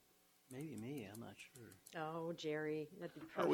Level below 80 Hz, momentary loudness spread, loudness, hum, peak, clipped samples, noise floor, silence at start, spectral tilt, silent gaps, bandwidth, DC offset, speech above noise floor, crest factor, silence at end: -84 dBFS; 14 LU; -48 LUFS; none; -24 dBFS; under 0.1%; -74 dBFS; 0.5 s; -5.5 dB/octave; none; 19 kHz; under 0.1%; 28 dB; 22 dB; 0 s